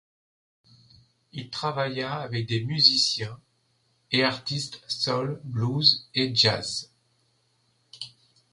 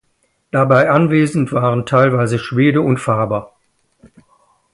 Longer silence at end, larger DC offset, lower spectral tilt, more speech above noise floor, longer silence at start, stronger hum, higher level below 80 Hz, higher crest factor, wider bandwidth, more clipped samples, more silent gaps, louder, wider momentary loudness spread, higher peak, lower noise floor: second, 0.45 s vs 1.3 s; neither; second, -4 dB/octave vs -7.5 dB/octave; second, 43 dB vs 50 dB; first, 1.35 s vs 0.55 s; neither; second, -64 dBFS vs -52 dBFS; first, 24 dB vs 16 dB; about the same, 11.5 kHz vs 11.5 kHz; neither; neither; second, -24 LUFS vs -15 LUFS; first, 19 LU vs 6 LU; second, -4 dBFS vs 0 dBFS; first, -69 dBFS vs -63 dBFS